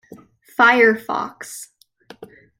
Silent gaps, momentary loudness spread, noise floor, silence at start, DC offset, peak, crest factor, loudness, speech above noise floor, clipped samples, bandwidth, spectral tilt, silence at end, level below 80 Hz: none; 21 LU; -45 dBFS; 0.6 s; under 0.1%; -2 dBFS; 18 dB; -16 LUFS; 28 dB; under 0.1%; 16.5 kHz; -3.5 dB/octave; 0.35 s; -68 dBFS